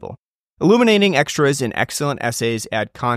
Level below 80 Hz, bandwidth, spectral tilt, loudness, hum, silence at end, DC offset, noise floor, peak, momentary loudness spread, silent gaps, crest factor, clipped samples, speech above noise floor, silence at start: -56 dBFS; 15.5 kHz; -4.5 dB/octave; -17 LUFS; none; 0 s; under 0.1%; -42 dBFS; -2 dBFS; 9 LU; 0.19-0.57 s; 16 dB; under 0.1%; 25 dB; 0 s